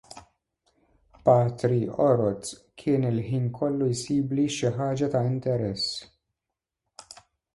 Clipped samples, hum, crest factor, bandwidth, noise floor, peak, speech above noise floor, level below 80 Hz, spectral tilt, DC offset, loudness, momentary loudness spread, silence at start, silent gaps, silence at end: under 0.1%; none; 20 dB; 11.5 kHz; -86 dBFS; -8 dBFS; 61 dB; -60 dBFS; -6.5 dB/octave; under 0.1%; -26 LUFS; 11 LU; 0.15 s; none; 1.5 s